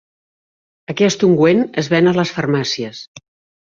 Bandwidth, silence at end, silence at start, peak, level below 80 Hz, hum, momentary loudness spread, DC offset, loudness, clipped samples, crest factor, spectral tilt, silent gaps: 7.6 kHz; 0.45 s; 0.9 s; -2 dBFS; -58 dBFS; none; 14 LU; under 0.1%; -15 LUFS; under 0.1%; 16 dB; -5.5 dB/octave; 3.08-3.15 s